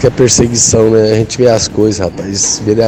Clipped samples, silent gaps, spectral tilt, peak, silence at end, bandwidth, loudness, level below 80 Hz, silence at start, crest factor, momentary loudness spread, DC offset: 0.5%; none; -4 dB/octave; 0 dBFS; 0 s; over 20 kHz; -10 LUFS; -34 dBFS; 0 s; 10 dB; 5 LU; under 0.1%